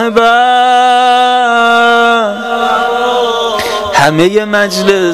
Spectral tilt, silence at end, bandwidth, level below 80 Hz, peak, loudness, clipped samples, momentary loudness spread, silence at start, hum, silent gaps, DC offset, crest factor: -3.5 dB/octave; 0 s; 15.5 kHz; -46 dBFS; 0 dBFS; -9 LUFS; 0.3%; 5 LU; 0 s; none; none; 0.6%; 8 dB